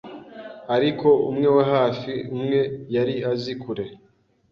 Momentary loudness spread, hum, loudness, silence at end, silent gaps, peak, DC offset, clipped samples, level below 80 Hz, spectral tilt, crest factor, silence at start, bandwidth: 18 LU; none; -22 LUFS; 0.55 s; none; -6 dBFS; under 0.1%; under 0.1%; -60 dBFS; -8 dB/octave; 16 dB; 0.05 s; 6.6 kHz